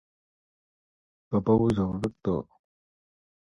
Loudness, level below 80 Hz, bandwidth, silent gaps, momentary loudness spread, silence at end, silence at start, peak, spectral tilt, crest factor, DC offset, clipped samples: -27 LUFS; -52 dBFS; 11 kHz; none; 8 LU; 1.15 s; 1.3 s; -10 dBFS; -9 dB/octave; 20 dB; under 0.1%; under 0.1%